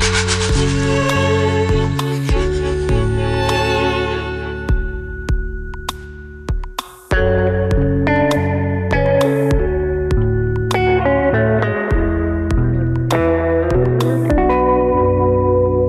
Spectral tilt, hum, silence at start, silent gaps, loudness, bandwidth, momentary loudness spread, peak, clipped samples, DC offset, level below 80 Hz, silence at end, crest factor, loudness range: -6 dB/octave; none; 0 s; none; -17 LUFS; 14 kHz; 10 LU; -4 dBFS; under 0.1%; under 0.1%; -24 dBFS; 0 s; 10 dB; 5 LU